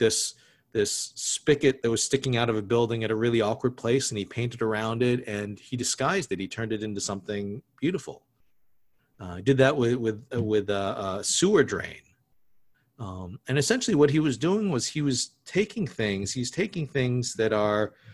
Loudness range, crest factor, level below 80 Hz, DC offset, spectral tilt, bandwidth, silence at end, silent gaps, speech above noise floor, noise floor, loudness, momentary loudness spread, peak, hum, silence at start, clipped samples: 4 LU; 20 dB; -56 dBFS; under 0.1%; -4.5 dB/octave; 12.5 kHz; 0 s; none; 48 dB; -74 dBFS; -26 LUFS; 11 LU; -6 dBFS; none; 0 s; under 0.1%